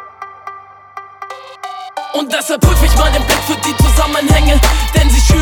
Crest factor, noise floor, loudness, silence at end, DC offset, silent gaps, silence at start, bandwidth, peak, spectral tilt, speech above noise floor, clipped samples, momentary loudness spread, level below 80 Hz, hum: 12 dB; -33 dBFS; -12 LUFS; 0 s; under 0.1%; none; 0 s; 18.5 kHz; 0 dBFS; -4.5 dB/octave; 23 dB; under 0.1%; 20 LU; -14 dBFS; none